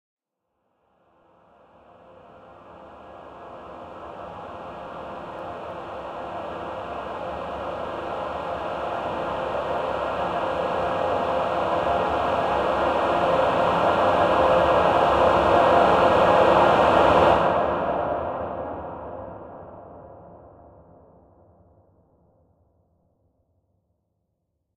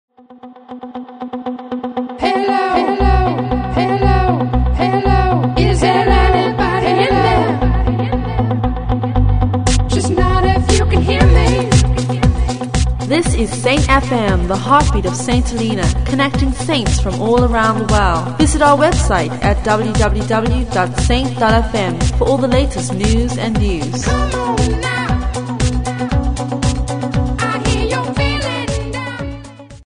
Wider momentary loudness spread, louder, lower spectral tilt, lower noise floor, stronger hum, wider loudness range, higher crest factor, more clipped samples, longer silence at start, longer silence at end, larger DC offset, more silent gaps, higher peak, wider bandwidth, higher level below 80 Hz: first, 22 LU vs 7 LU; second, -22 LUFS vs -15 LUFS; about the same, -6 dB/octave vs -5.5 dB/octave; first, -77 dBFS vs -38 dBFS; neither; first, 21 LU vs 4 LU; first, 20 dB vs 14 dB; neither; first, 2.45 s vs 0.3 s; first, 4.3 s vs 0.1 s; neither; neither; second, -4 dBFS vs 0 dBFS; about the same, 11.5 kHz vs 10.5 kHz; second, -48 dBFS vs -20 dBFS